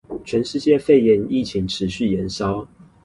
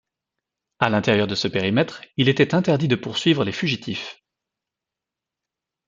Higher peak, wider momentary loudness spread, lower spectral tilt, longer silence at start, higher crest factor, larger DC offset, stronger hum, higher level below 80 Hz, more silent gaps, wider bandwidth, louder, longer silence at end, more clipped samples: about the same, -2 dBFS vs -2 dBFS; about the same, 10 LU vs 8 LU; about the same, -6.5 dB/octave vs -6 dB/octave; second, 0.1 s vs 0.8 s; about the same, 16 dB vs 20 dB; neither; neither; first, -46 dBFS vs -60 dBFS; neither; first, 11.5 kHz vs 7.8 kHz; about the same, -20 LUFS vs -21 LUFS; second, 0.4 s vs 1.75 s; neither